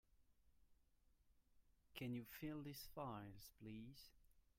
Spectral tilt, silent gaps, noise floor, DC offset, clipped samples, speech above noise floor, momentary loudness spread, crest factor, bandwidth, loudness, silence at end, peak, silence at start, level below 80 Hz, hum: -5.5 dB/octave; none; -78 dBFS; under 0.1%; under 0.1%; 24 dB; 10 LU; 18 dB; 16 kHz; -54 LUFS; 0.2 s; -38 dBFS; 0.2 s; -74 dBFS; none